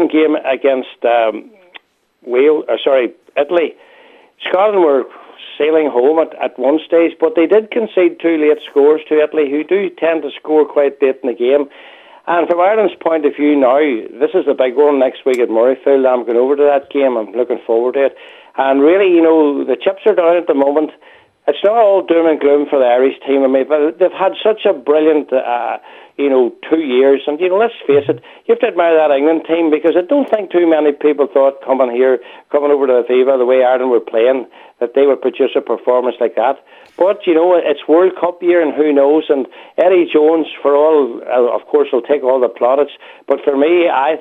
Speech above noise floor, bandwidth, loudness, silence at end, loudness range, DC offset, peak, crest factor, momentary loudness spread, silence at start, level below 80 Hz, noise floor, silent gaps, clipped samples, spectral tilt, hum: 32 dB; 7.8 kHz; -13 LUFS; 0 s; 2 LU; under 0.1%; 0 dBFS; 12 dB; 7 LU; 0 s; -74 dBFS; -44 dBFS; none; under 0.1%; -6.5 dB/octave; none